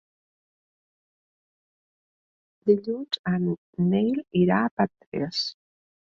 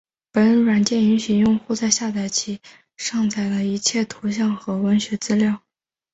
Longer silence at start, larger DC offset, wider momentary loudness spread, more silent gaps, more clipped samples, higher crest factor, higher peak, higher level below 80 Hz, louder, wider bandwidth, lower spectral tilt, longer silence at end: first, 2.65 s vs 0.35 s; neither; about the same, 7 LU vs 8 LU; first, 3.19-3.24 s, 3.58-3.73 s, 4.71-4.77 s, 5.07-5.12 s vs none; neither; about the same, 20 dB vs 18 dB; second, -8 dBFS vs -2 dBFS; second, -64 dBFS vs -58 dBFS; second, -26 LUFS vs -20 LUFS; second, 7.4 kHz vs 8.2 kHz; first, -7 dB/octave vs -4.5 dB/octave; about the same, 0.65 s vs 0.55 s